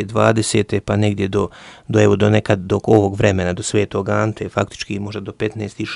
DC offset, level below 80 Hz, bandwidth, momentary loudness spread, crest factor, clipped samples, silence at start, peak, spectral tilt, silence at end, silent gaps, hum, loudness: under 0.1%; -44 dBFS; 11.5 kHz; 11 LU; 18 dB; under 0.1%; 0 s; 0 dBFS; -6 dB/octave; 0 s; none; none; -18 LUFS